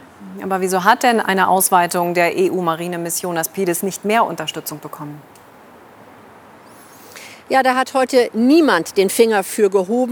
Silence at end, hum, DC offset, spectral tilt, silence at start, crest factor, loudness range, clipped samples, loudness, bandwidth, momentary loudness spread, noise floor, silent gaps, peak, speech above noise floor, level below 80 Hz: 0 s; none; under 0.1%; -4 dB/octave; 0.2 s; 18 dB; 9 LU; under 0.1%; -16 LUFS; over 20 kHz; 17 LU; -43 dBFS; none; 0 dBFS; 27 dB; -70 dBFS